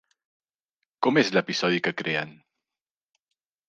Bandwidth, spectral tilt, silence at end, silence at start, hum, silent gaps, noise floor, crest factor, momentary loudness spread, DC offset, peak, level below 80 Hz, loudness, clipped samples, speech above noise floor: 9 kHz; -4.5 dB/octave; 1.35 s; 1 s; none; none; under -90 dBFS; 22 dB; 7 LU; under 0.1%; -6 dBFS; -76 dBFS; -24 LUFS; under 0.1%; over 65 dB